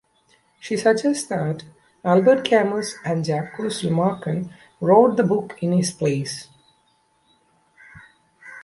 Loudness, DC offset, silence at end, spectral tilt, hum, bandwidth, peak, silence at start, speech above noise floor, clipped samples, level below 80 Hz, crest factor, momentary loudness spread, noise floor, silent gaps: -21 LUFS; under 0.1%; 0 s; -6 dB/octave; none; 11.5 kHz; -2 dBFS; 0.65 s; 43 dB; under 0.1%; -62 dBFS; 20 dB; 13 LU; -63 dBFS; none